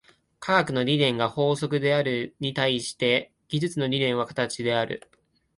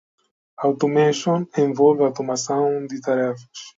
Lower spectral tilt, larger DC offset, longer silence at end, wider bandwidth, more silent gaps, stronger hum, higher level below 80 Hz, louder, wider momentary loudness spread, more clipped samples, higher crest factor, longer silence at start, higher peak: about the same, -5 dB/octave vs -5.5 dB/octave; neither; first, 0.6 s vs 0.1 s; first, 11.5 kHz vs 7.8 kHz; neither; neither; first, -64 dBFS vs -70 dBFS; second, -25 LUFS vs -20 LUFS; about the same, 7 LU vs 8 LU; neither; about the same, 20 dB vs 18 dB; second, 0.4 s vs 0.6 s; about the same, -6 dBFS vs -4 dBFS